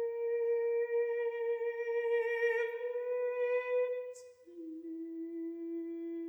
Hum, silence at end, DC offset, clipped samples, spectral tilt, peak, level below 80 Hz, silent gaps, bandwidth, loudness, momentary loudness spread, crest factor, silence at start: none; 0 s; under 0.1%; under 0.1%; -3.5 dB/octave; -22 dBFS; -90 dBFS; none; 8.2 kHz; -35 LUFS; 12 LU; 12 dB; 0 s